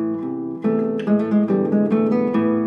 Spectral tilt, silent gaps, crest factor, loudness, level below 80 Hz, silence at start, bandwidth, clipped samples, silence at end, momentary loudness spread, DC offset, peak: -10 dB/octave; none; 12 dB; -20 LUFS; -66 dBFS; 0 s; 5 kHz; under 0.1%; 0 s; 6 LU; under 0.1%; -6 dBFS